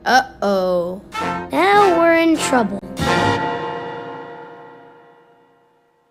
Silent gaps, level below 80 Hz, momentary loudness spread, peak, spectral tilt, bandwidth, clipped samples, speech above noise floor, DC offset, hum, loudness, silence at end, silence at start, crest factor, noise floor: none; -48 dBFS; 19 LU; 0 dBFS; -4.5 dB/octave; 16 kHz; under 0.1%; 41 dB; under 0.1%; 60 Hz at -50 dBFS; -17 LUFS; 1.35 s; 0.05 s; 18 dB; -58 dBFS